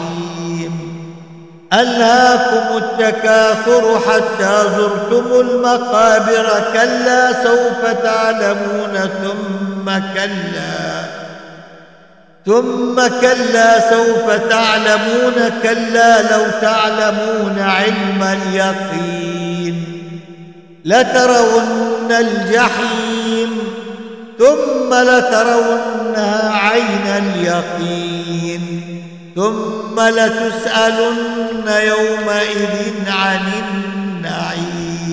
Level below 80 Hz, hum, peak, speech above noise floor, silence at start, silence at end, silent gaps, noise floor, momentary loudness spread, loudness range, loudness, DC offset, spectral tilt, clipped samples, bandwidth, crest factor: -56 dBFS; none; 0 dBFS; 32 dB; 0 s; 0 s; none; -45 dBFS; 12 LU; 6 LU; -14 LUFS; 0.3%; -4 dB/octave; under 0.1%; 8 kHz; 14 dB